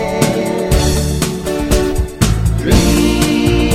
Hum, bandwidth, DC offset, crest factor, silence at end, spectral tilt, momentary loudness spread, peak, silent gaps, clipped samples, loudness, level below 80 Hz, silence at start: none; 16 kHz; under 0.1%; 12 dB; 0 s; -5 dB/octave; 5 LU; 0 dBFS; none; under 0.1%; -14 LUFS; -18 dBFS; 0 s